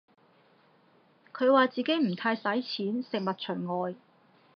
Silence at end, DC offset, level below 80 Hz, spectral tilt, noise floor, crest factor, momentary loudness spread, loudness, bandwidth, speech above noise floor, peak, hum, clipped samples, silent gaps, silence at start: 0.6 s; under 0.1%; -88 dBFS; -7.5 dB/octave; -63 dBFS; 20 dB; 11 LU; -29 LUFS; 6.2 kHz; 35 dB; -10 dBFS; none; under 0.1%; none; 1.35 s